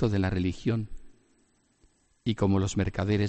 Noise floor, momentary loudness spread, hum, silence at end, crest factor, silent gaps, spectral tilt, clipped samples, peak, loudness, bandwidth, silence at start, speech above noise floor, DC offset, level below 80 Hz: -67 dBFS; 8 LU; none; 0 s; 16 dB; none; -7 dB/octave; under 0.1%; -12 dBFS; -29 LUFS; 8.4 kHz; 0 s; 41 dB; under 0.1%; -48 dBFS